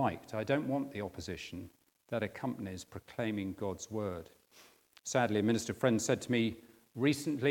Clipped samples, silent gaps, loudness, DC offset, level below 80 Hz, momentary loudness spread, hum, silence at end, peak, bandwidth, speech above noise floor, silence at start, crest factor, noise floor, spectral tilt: under 0.1%; none; -35 LUFS; under 0.1%; -70 dBFS; 15 LU; none; 0 s; -14 dBFS; 18 kHz; 28 dB; 0 s; 22 dB; -63 dBFS; -5 dB/octave